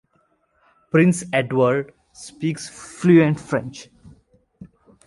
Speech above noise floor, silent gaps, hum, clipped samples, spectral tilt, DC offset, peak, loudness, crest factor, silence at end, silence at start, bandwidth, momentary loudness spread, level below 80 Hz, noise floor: 46 dB; none; none; under 0.1%; -6.5 dB/octave; under 0.1%; -4 dBFS; -19 LUFS; 18 dB; 0.4 s; 0.95 s; 11.5 kHz; 22 LU; -58 dBFS; -65 dBFS